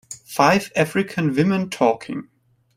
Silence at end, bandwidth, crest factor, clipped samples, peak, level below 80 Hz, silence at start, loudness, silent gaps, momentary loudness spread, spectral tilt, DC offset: 0.55 s; 16 kHz; 20 dB; under 0.1%; -2 dBFS; -58 dBFS; 0.1 s; -20 LUFS; none; 13 LU; -5.5 dB/octave; under 0.1%